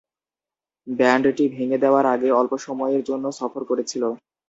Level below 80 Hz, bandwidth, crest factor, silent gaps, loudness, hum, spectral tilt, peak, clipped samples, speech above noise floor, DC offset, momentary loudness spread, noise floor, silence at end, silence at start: -66 dBFS; 8 kHz; 18 dB; none; -21 LUFS; none; -5 dB/octave; -4 dBFS; under 0.1%; over 69 dB; under 0.1%; 10 LU; under -90 dBFS; 0.3 s; 0.85 s